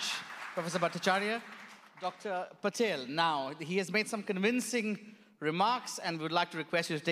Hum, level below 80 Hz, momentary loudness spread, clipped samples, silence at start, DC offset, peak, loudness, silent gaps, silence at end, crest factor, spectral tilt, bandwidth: none; -86 dBFS; 9 LU; under 0.1%; 0 s; under 0.1%; -14 dBFS; -33 LUFS; none; 0 s; 20 dB; -4 dB/octave; 15.5 kHz